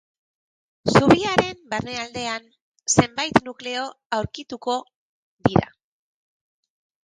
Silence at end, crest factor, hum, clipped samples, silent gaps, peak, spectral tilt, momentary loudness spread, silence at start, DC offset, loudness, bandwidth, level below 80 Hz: 1.4 s; 24 dB; none; under 0.1%; 2.61-2.72 s, 4.06-4.10 s, 4.95-5.37 s; 0 dBFS; -4.5 dB/octave; 13 LU; 0.85 s; under 0.1%; -22 LUFS; 11 kHz; -50 dBFS